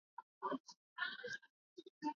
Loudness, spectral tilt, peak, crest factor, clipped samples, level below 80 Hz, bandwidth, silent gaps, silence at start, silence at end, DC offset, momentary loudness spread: -47 LUFS; -0.5 dB/octave; -30 dBFS; 20 dB; under 0.1%; under -90 dBFS; 7.2 kHz; 0.23-0.41 s, 0.60-0.64 s, 0.77-0.96 s, 1.50-1.76 s, 1.90-2.01 s; 0.2 s; 0.05 s; under 0.1%; 17 LU